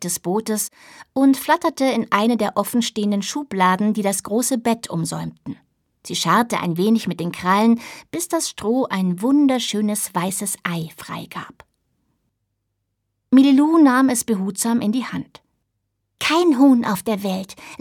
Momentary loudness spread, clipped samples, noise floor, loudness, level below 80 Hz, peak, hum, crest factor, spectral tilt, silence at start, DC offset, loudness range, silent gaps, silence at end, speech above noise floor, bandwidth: 15 LU; under 0.1%; -75 dBFS; -19 LUFS; -62 dBFS; -2 dBFS; none; 18 dB; -4.5 dB/octave; 0 s; under 0.1%; 4 LU; none; 0.05 s; 56 dB; 17.5 kHz